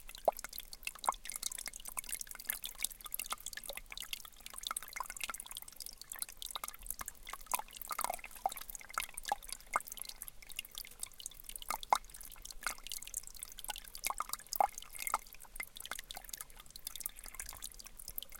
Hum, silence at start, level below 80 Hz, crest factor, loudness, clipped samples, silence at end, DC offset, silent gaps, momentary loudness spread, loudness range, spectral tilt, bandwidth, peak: none; 0 s; -58 dBFS; 30 dB; -42 LUFS; under 0.1%; 0 s; under 0.1%; none; 10 LU; 3 LU; 0.5 dB/octave; 17 kHz; -12 dBFS